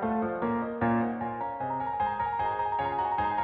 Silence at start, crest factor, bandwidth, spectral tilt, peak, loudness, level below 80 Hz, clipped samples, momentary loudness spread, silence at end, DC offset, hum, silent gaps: 0 s; 14 dB; 4.8 kHz; -5.5 dB/octave; -16 dBFS; -30 LUFS; -56 dBFS; under 0.1%; 5 LU; 0 s; under 0.1%; none; none